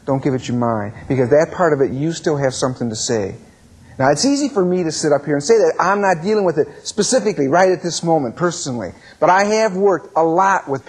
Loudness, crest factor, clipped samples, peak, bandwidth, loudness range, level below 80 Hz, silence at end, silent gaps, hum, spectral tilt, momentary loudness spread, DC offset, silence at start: -17 LUFS; 16 dB; under 0.1%; -2 dBFS; 11 kHz; 3 LU; -54 dBFS; 0.05 s; none; none; -4.5 dB/octave; 7 LU; under 0.1%; 0.05 s